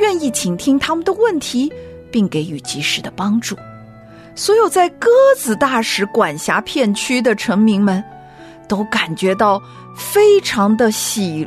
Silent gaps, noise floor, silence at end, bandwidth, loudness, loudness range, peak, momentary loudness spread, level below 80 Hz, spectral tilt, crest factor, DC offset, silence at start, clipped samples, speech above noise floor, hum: none; -39 dBFS; 0 s; 14 kHz; -15 LUFS; 4 LU; -2 dBFS; 11 LU; -52 dBFS; -4 dB/octave; 14 dB; under 0.1%; 0 s; under 0.1%; 24 dB; none